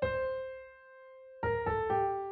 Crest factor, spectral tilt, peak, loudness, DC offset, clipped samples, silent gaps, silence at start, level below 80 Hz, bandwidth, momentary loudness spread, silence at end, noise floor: 14 dB; -5 dB/octave; -20 dBFS; -34 LUFS; under 0.1%; under 0.1%; none; 0 s; -54 dBFS; 4.7 kHz; 22 LU; 0 s; -54 dBFS